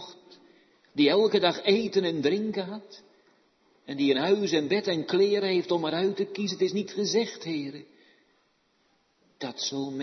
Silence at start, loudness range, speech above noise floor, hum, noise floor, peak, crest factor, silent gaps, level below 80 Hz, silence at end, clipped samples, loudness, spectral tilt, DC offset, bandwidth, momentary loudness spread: 0 s; 6 LU; 43 dB; none; -69 dBFS; -10 dBFS; 18 dB; none; -76 dBFS; 0 s; under 0.1%; -26 LUFS; -4.5 dB/octave; under 0.1%; 6.4 kHz; 15 LU